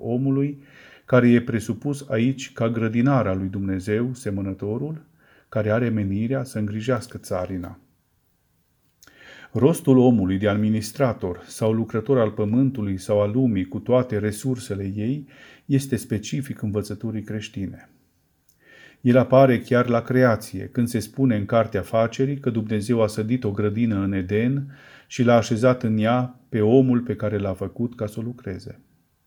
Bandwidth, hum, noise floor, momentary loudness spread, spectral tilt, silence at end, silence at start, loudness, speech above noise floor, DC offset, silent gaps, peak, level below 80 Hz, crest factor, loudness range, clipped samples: 20 kHz; none; -66 dBFS; 12 LU; -7.5 dB/octave; 0.55 s; 0 s; -22 LUFS; 45 dB; under 0.1%; none; -2 dBFS; -58 dBFS; 20 dB; 7 LU; under 0.1%